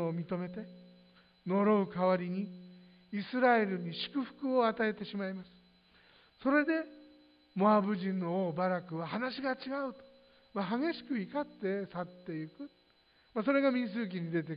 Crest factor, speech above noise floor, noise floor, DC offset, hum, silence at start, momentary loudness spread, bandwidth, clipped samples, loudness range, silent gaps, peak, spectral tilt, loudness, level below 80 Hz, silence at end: 18 dB; 35 dB; -68 dBFS; under 0.1%; none; 0 s; 14 LU; 5.2 kHz; under 0.1%; 5 LU; none; -16 dBFS; -10 dB/octave; -34 LUFS; -76 dBFS; 0 s